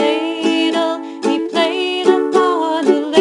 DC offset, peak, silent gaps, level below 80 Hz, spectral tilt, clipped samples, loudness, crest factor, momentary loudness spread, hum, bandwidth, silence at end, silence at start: under 0.1%; 0 dBFS; none; -68 dBFS; -3.5 dB/octave; under 0.1%; -16 LUFS; 16 dB; 5 LU; none; 11.5 kHz; 0 s; 0 s